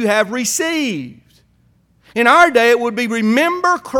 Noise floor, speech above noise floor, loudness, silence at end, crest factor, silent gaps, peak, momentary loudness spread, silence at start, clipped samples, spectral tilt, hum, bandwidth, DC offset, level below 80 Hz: -56 dBFS; 41 dB; -14 LUFS; 0 s; 16 dB; none; 0 dBFS; 13 LU; 0 s; under 0.1%; -3 dB/octave; none; 18.5 kHz; under 0.1%; -58 dBFS